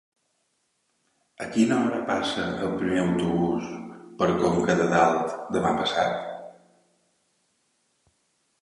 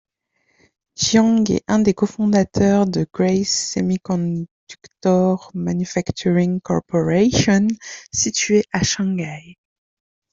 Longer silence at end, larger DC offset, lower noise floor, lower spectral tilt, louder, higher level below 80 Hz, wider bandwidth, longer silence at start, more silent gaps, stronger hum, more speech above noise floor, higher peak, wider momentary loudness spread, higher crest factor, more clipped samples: first, 2.1 s vs 0.8 s; neither; first, -73 dBFS vs -67 dBFS; about the same, -5.5 dB/octave vs -5 dB/octave; second, -25 LUFS vs -19 LUFS; second, -56 dBFS vs -48 dBFS; first, 11.5 kHz vs 7.8 kHz; first, 1.4 s vs 1 s; second, none vs 4.51-4.67 s; neither; about the same, 49 dB vs 49 dB; second, -6 dBFS vs -2 dBFS; first, 14 LU vs 8 LU; about the same, 20 dB vs 16 dB; neither